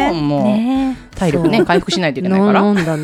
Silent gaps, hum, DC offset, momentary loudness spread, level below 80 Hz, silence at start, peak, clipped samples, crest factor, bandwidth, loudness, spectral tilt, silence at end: none; none; under 0.1%; 6 LU; -40 dBFS; 0 s; 0 dBFS; under 0.1%; 14 dB; 13.5 kHz; -15 LUFS; -6.5 dB/octave; 0 s